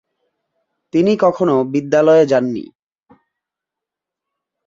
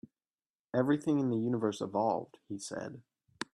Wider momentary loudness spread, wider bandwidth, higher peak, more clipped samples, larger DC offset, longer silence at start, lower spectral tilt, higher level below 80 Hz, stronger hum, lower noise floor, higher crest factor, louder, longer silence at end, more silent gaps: second, 10 LU vs 14 LU; second, 7.6 kHz vs 12 kHz; first, -2 dBFS vs -16 dBFS; neither; neither; first, 0.95 s vs 0.75 s; about the same, -7 dB/octave vs -6.5 dB/octave; first, -62 dBFS vs -76 dBFS; neither; second, -84 dBFS vs under -90 dBFS; about the same, 16 dB vs 18 dB; first, -15 LUFS vs -33 LUFS; first, 2 s vs 0.1 s; neither